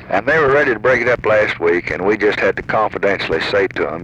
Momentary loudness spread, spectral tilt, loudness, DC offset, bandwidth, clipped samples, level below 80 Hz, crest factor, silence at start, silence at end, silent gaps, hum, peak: 4 LU; -6 dB/octave; -15 LUFS; under 0.1%; 8.6 kHz; under 0.1%; -44 dBFS; 12 dB; 0 s; 0 s; none; none; -4 dBFS